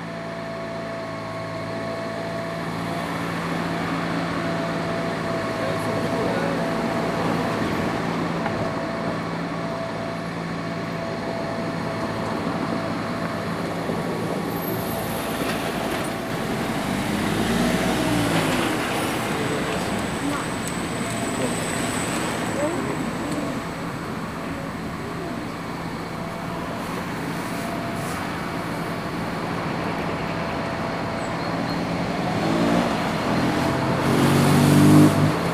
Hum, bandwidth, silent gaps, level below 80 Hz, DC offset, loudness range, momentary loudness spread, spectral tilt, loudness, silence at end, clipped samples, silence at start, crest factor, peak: none; 16.5 kHz; none; -46 dBFS; under 0.1%; 6 LU; 9 LU; -5.5 dB/octave; -24 LUFS; 0 s; under 0.1%; 0 s; 22 dB; -2 dBFS